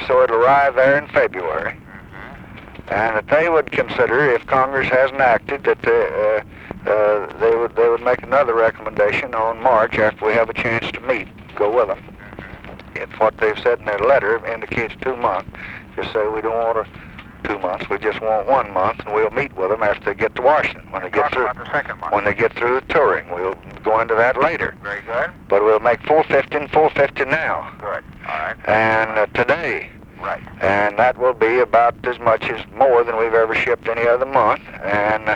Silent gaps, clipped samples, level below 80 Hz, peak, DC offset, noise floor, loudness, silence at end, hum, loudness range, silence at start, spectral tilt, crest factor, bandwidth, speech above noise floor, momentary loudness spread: none; under 0.1%; -46 dBFS; -2 dBFS; under 0.1%; -37 dBFS; -18 LUFS; 0 s; none; 4 LU; 0 s; -6.5 dB/octave; 16 dB; 8.2 kHz; 19 dB; 13 LU